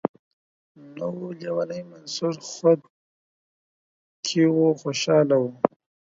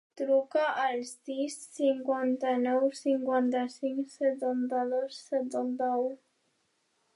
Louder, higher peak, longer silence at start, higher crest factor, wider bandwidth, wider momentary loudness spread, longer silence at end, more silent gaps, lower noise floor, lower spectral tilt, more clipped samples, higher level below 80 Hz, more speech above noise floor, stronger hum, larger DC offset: first, -24 LUFS vs -30 LUFS; first, 0 dBFS vs -16 dBFS; about the same, 0.05 s vs 0.15 s; first, 24 dB vs 14 dB; second, 7.8 kHz vs 11.5 kHz; first, 13 LU vs 7 LU; second, 0.45 s vs 1 s; first, 0.09-0.75 s, 2.90-4.23 s vs none; first, under -90 dBFS vs -75 dBFS; first, -5.5 dB/octave vs -3.5 dB/octave; neither; first, -76 dBFS vs -90 dBFS; first, over 67 dB vs 45 dB; neither; neither